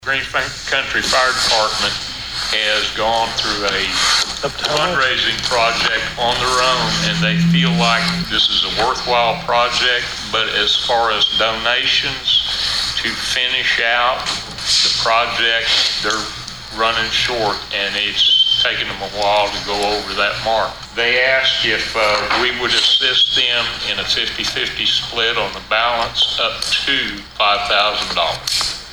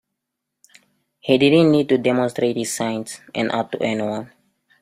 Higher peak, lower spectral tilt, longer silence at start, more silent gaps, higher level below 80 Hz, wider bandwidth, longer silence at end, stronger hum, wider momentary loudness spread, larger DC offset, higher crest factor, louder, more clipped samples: about the same, -2 dBFS vs -2 dBFS; second, -2.5 dB/octave vs -5 dB/octave; second, 0 s vs 1.25 s; neither; first, -40 dBFS vs -60 dBFS; first, 19.5 kHz vs 15.5 kHz; second, 0 s vs 0.55 s; neither; second, 6 LU vs 14 LU; neither; about the same, 16 dB vs 18 dB; first, -15 LUFS vs -19 LUFS; neither